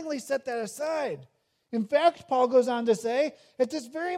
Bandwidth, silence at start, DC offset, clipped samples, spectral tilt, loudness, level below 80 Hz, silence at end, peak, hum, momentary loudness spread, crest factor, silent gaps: 15 kHz; 0 s; under 0.1%; under 0.1%; -4.5 dB/octave; -27 LUFS; -80 dBFS; 0 s; -10 dBFS; none; 10 LU; 18 dB; none